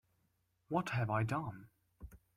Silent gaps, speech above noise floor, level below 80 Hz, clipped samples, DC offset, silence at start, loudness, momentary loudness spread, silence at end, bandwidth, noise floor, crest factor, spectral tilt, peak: none; 42 dB; -64 dBFS; under 0.1%; under 0.1%; 0.7 s; -38 LUFS; 22 LU; 0.2 s; 14.5 kHz; -79 dBFS; 20 dB; -7 dB/octave; -22 dBFS